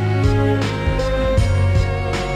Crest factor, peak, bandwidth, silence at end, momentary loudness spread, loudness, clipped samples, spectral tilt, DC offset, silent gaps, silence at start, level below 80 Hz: 12 dB; -6 dBFS; 10.5 kHz; 0 s; 4 LU; -18 LUFS; under 0.1%; -7 dB/octave; under 0.1%; none; 0 s; -24 dBFS